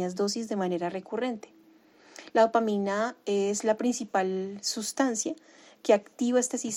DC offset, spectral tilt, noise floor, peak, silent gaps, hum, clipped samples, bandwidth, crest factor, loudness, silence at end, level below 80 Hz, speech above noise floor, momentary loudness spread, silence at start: under 0.1%; -4 dB/octave; -58 dBFS; -10 dBFS; none; none; under 0.1%; 16.5 kHz; 20 dB; -28 LUFS; 0 s; -78 dBFS; 30 dB; 8 LU; 0 s